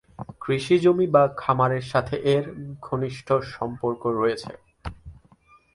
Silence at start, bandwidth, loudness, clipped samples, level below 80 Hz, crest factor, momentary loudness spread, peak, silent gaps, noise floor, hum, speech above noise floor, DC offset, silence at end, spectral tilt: 0.2 s; 11.5 kHz; -23 LUFS; under 0.1%; -50 dBFS; 20 dB; 20 LU; -4 dBFS; none; -57 dBFS; none; 34 dB; under 0.1%; 0.6 s; -7 dB/octave